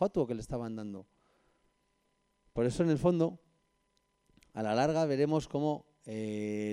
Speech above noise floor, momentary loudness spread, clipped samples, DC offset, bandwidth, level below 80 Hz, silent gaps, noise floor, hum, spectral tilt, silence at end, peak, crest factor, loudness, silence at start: 45 dB; 13 LU; under 0.1%; under 0.1%; 11.5 kHz; -60 dBFS; none; -76 dBFS; 50 Hz at -65 dBFS; -7 dB/octave; 0 s; -16 dBFS; 18 dB; -33 LUFS; 0 s